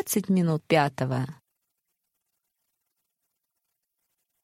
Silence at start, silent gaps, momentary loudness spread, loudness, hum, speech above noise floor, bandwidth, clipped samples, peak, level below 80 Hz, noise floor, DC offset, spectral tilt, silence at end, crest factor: 0 s; none; 8 LU; -25 LUFS; none; 56 dB; 16 kHz; under 0.1%; -6 dBFS; -68 dBFS; -81 dBFS; under 0.1%; -5.5 dB/octave; 3.1 s; 24 dB